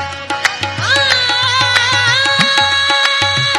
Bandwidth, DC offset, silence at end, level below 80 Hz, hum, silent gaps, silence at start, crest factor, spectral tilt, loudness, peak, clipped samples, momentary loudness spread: over 20 kHz; under 0.1%; 0 s; -52 dBFS; none; none; 0 s; 14 dB; -1.5 dB/octave; -11 LUFS; 0 dBFS; under 0.1%; 6 LU